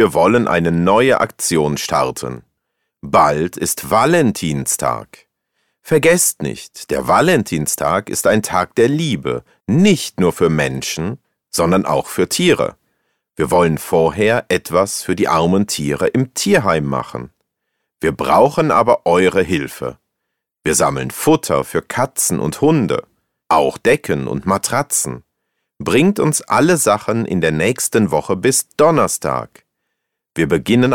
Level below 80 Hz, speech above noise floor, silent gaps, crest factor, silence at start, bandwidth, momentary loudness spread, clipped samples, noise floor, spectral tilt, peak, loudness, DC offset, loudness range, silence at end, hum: -46 dBFS; 61 dB; none; 16 dB; 0 s; 19 kHz; 10 LU; under 0.1%; -77 dBFS; -4.5 dB/octave; 0 dBFS; -16 LUFS; under 0.1%; 2 LU; 0 s; none